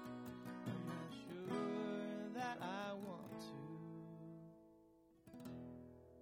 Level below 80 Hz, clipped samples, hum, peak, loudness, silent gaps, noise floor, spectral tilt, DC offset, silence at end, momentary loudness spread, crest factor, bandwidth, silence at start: -80 dBFS; under 0.1%; none; -30 dBFS; -49 LUFS; none; -70 dBFS; -6.5 dB/octave; under 0.1%; 0 s; 17 LU; 18 dB; 16 kHz; 0 s